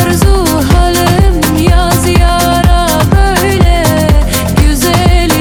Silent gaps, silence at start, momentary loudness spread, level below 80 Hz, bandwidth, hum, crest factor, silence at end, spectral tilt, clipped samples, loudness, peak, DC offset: none; 0 s; 1 LU; -12 dBFS; 19.5 kHz; none; 8 dB; 0 s; -5 dB/octave; 0.7%; -9 LUFS; 0 dBFS; under 0.1%